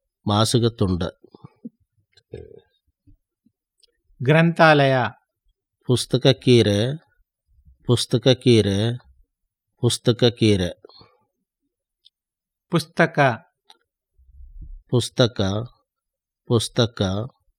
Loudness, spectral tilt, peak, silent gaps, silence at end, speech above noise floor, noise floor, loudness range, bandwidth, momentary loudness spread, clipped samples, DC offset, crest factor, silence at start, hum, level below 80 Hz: -20 LUFS; -5.5 dB/octave; 0 dBFS; none; 0.3 s; 69 dB; -87 dBFS; 7 LU; 15 kHz; 14 LU; under 0.1%; under 0.1%; 22 dB; 0.25 s; none; -54 dBFS